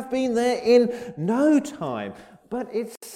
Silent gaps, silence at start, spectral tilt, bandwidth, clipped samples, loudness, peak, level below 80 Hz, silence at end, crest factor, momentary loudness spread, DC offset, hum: none; 0 s; -5.5 dB/octave; 15 kHz; under 0.1%; -23 LUFS; -6 dBFS; -62 dBFS; 0 s; 18 dB; 14 LU; under 0.1%; none